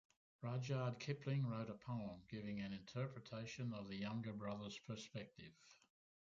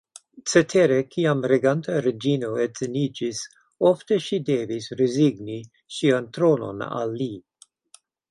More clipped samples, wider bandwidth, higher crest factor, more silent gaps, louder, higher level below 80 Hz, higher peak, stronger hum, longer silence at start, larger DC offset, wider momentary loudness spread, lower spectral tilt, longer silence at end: neither; second, 7.4 kHz vs 11.5 kHz; about the same, 18 dB vs 20 dB; neither; second, -48 LUFS vs -23 LUFS; second, -76 dBFS vs -64 dBFS; second, -30 dBFS vs -2 dBFS; neither; about the same, 0.4 s vs 0.35 s; neither; second, 10 LU vs 13 LU; about the same, -6.5 dB/octave vs -5.5 dB/octave; second, 0.55 s vs 0.9 s